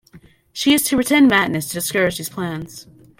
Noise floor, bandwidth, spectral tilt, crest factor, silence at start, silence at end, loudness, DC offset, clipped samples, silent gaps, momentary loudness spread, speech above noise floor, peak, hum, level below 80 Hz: -48 dBFS; 17 kHz; -3.5 dB/octave; 18 dB; 0.15 s; 0.35 s; -17 LUFS; under 0.1%; under 0.1%; none; 16 LU; 30 dB; -2 dBFS; none; -52 dBFS